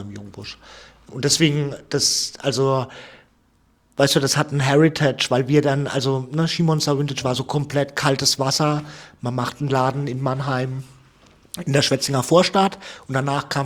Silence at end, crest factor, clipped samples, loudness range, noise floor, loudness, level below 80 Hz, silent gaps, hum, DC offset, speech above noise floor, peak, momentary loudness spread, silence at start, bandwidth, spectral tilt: 0 s; 20 dB; under 0.1%; 3 LU; -60 dBFS; -20 LUFS; -56 dBFS; none; none; under 0.1%; 40 dB; -2 dBFS; 17 LU; 0 s; 16.5 kHz; -4.5 dB/octave